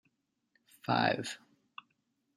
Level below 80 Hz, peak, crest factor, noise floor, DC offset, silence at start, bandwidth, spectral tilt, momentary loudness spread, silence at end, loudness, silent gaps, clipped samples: -78 dBFS; -14 dBFS; 24 dB; -79 dBFS; under 0.1%; 0.85 s; 15 kHz; -4.5 dB/octave; 23 LU; 1 s; -33 LUFS; none; under 0.1%